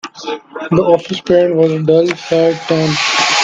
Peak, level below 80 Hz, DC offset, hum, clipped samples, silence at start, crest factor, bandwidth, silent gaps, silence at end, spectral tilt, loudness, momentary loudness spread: 0 dBFS; -50 dBFS; under 0.1%; none; under 0.1%; 0.05 s; 12 dB; 9.2 kHz; none; 0 s; -4.5 dB/octave; -13 LUFS; 13 LU